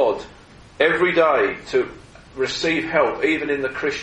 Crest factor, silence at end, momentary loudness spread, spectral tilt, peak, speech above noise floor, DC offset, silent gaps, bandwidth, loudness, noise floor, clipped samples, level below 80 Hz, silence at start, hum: 18 dB; 0 s; 12 LU; -4.5 dB/octave; -4 dBFS; 25 dB; under 0.1%; none; 9.4 kHz; -20 LUFS; -45 dBFS; under 0.1%; -50 dBFS; 0 s; none